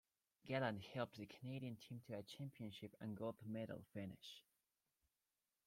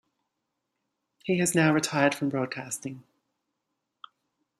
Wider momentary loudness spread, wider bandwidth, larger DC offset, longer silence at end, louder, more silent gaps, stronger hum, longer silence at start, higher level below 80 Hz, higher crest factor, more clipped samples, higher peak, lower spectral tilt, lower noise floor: second, 11 LU vs 17 LU; first, 16.5 kHz vs 14.5 kHz; neither; second, 1.25 s vs 1.6 s; second, -51 LUFS vs -26 LUFS; neither; neither; second, 0.45 s vs 1.25 s; second, -84 dBFS vs -72 dBFS; about the same, 22 dB vs 22 dB; neither; second, -30 dBFS vs -8 dBFS; first, -6.5 dB/octave vs -4.5 dB/octave; first, under -90 dBFS vs -82 dBFS